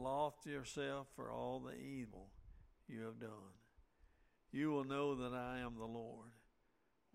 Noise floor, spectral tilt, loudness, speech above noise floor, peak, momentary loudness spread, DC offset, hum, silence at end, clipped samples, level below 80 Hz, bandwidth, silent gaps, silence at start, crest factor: -81 dBFS; -6 dB/octave; -46 LUFS; 35 dB; -28 dBFS; 18 LU; under 0.1%; none; 0.75 s; under 0.1%; -68 dBFS; 16 kHz; none; 0 s; 18 dB